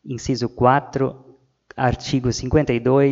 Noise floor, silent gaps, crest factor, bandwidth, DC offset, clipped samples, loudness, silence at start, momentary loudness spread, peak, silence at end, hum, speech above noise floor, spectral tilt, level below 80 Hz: -49 dBFS; none; 20 dB; 7.8 kHz; under 0.1%; under 0.1%; -20 LUFS; 0.05 s; 8 LU; 0 dBFS; 0 s; none; 30 dB; -6.5 dB/octave; -40 dBFS